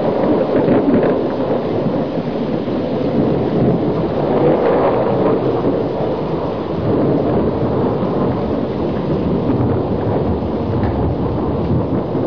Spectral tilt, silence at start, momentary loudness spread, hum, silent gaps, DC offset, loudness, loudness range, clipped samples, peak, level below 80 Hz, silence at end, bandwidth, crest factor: -10 dB/octave; 0 s; 5 LU; none; none; 1%; -17 LUFS; 2 LU; under 0.1%; -4 dBFS; -34 dBFS; 0 s; 5.4 kHz; 12 dB